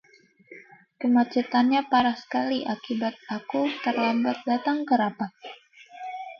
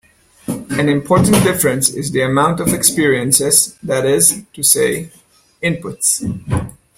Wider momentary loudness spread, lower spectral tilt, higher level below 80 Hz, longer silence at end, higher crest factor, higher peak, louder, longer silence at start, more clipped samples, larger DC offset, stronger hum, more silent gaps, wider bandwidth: about the same, 13 LU vs 11 LU; first, -6 dB/octave vs -3.5 dB/octave; second, -70 dBFS vs -44 dBFS; second, 0.05 s vs 0.3 s; about the same, 18 dB vs 16 dB; second, -8 dBFS vs 0 dBFS; second, -25 LUFS vs -14 LUFS; about the same, 0.5 s vs 0.5 s; neither; neither; neither; neither; second, 6.4 kHz vs 17 kHz